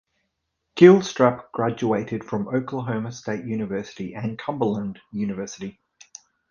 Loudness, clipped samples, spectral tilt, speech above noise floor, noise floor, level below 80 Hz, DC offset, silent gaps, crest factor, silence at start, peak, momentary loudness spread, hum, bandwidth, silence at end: -22 LUFS; under 0.1%; -6.5 dB/octave; 55 dB; -77 dBFS; -60 dBFS; under 0.1%; none; 22 dB; 0.75 s; 0 dBFS; 18 LU; none; 7.2 kHz; 0.8 s